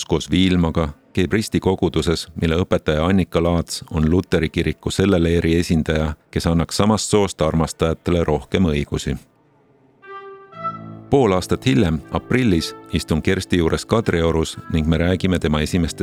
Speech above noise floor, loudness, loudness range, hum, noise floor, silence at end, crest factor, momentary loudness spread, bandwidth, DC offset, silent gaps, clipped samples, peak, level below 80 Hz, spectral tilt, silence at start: 37 dB; -19 LUFS; 4 LU; none; -56 dBFS; 0 s; 18 dB; 7 LU; 15 kHz; under 0.1%; none; under 0.1%; -2 dBFS; -34 dBFS; -6 dB/octave; 0 s